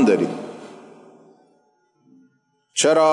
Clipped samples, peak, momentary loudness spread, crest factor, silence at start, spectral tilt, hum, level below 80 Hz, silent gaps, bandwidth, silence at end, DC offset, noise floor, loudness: under 0.1%; -6 dBFS; 25 LU; 16 dB; 0 s; -3.5 dB/octave; none; -76 dBFS; none; 11.5 kHz; 0 s; under 0.1%; -64 dBFS; -20 LUFS